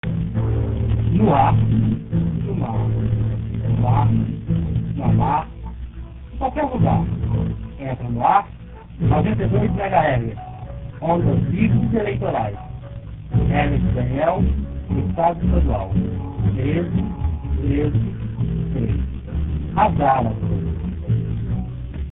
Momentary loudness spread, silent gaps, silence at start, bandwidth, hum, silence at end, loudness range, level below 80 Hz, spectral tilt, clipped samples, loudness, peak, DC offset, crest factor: 12 LU; none; 0.05 s; 3.9 kHz; none; 0 s; 3 LU; -28 dBFS; -13 dB/octave; under 0.1%; -21 LUFS; -2 dBFS; under 0.1%; 18 dB